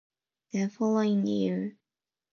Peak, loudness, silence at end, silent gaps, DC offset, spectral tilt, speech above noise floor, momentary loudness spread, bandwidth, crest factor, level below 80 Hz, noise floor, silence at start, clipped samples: -16 dBFS; -29 LUFS; 0.65 s; none; under 0.1%; -7 dB/octave; over 63 dB; 10 LU; 7 kHz; 14 dB; -78 dBFS; under -90 dBFS; 0.55 s; under 0.1%